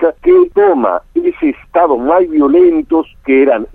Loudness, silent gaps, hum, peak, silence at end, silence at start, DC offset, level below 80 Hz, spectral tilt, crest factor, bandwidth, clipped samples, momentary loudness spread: -11 LUFS; none; none; 0 dBFS; 0.1 s; 0 s; under 0.1%; -42 dBFS; -8.5 dB/octave; 10 dB; 3.7 kHz; under 0.1%; 7 LU